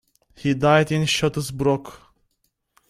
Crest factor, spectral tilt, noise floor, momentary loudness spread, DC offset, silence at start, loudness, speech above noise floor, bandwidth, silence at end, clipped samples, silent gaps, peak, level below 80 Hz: 20 dB; -5 dB/octave; -72 dBFS; 9 LU; under 0.1%; 0.4 s; -21 LUFS; 51 dB; 14 kHz; 0.95 s; under 0.1%; none; -4 dBFS; -52 dBFS